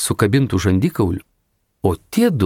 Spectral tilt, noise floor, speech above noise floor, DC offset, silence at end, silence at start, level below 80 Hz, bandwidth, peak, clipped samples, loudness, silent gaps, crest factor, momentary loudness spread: -6 dB/octave; -67 dBFS; 50 dB; under 0.1%; 0 s; 0 s; -42 dBFS; 18.5 kHz; -2 dBFS; under 0.1%; -18 LUFS; none; 16 dB; 6 LU